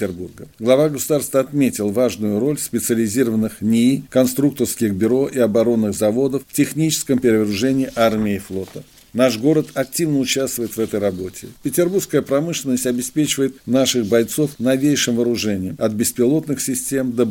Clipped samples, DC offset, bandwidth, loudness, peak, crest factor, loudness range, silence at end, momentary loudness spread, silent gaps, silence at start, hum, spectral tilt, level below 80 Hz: under 0.1%; under 0.1%; 17 kHz; -18 LUFS; -2 dBFS; 18 dB; 2 LU; 0 s; 6 LU; none; 0 s; none; -5 dB/octave; -54 dBFS